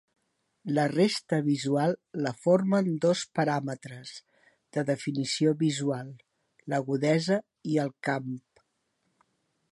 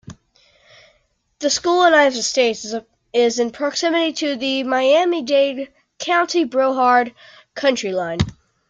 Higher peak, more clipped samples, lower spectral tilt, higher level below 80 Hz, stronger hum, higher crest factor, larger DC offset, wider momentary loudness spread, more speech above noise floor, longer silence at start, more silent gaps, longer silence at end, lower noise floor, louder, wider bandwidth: second, -10 dBFS vs -2 dBFS; neither; first, -6 dB/octave vs -3.5 dB/octave; second, -76 dBFS vs -50 dBFS; neither; about the same, 18 dB vs 16 dB; neither; first, 15 LU vs 12 LU; first, 49 dB vs 45 dB; first, 0.65 s vs 0.1 s; neither; first, 1.3 s vs 0.35 s; first, -76 dBFS vs -63 dBFS; second, -28 LUFS vs -18 LUFS; first, 11.5 kHz vs 9.4 kHz